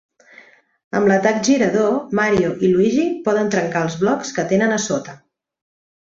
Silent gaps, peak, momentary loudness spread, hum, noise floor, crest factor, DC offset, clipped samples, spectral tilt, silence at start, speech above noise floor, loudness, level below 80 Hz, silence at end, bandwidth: none; -2 dBFS; 6 LU; none; -48 dBFS; 16 dB; under 0.1%; under 0.1%; -5 dB/octave; 0.95 s; 31 dB; -18 LUFS; -56 dBFS; 0.95 s; 7.8 kHz